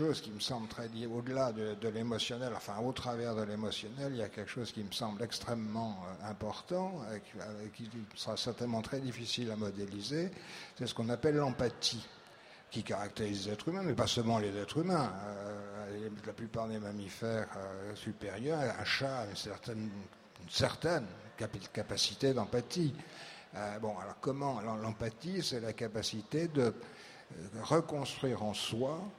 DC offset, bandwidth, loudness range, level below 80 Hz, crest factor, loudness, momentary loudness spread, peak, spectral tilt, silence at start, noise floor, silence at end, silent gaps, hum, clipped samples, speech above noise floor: under 0.1%; 16 kHz; 4 LU; -66 dBFS; 24 dB; -38 LUFS; 12 LU; -14 dBFS; -5 dB/octave; 0 s; -57 dBFS; 0 s; none; none; under 0.1%; 20 dB